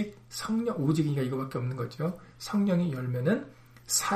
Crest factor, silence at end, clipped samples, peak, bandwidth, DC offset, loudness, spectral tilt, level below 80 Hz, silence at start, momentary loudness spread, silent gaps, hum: 16 dB; 0 s; under 0.1%; -14 dBFS; 15.5 kHz; under 0.1%; -30 LUFS; -5 dB/octave; -62 dBFS; 0 s; 8 LU; none; none